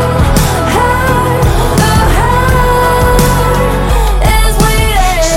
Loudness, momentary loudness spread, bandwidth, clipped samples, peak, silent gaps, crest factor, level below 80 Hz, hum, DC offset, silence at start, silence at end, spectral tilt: -10 LUFS; 2 LU; 17 kHz; under 0.1%; 0 dBFS; none; 8 dB; -12 dBFS; none; 0.6%; 0 s; 0 s; -5 dB/octave